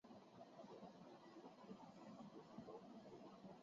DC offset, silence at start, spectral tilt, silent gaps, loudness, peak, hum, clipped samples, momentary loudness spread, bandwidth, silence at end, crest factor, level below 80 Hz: under 0.1%; 0.05 s; -5.5 dB/octave; none; -61 LUFS; -44 dBFS; none; under 0.1%; 4 LU; 7.4 kHz; 0 s; 16 dB; under -90 dBFS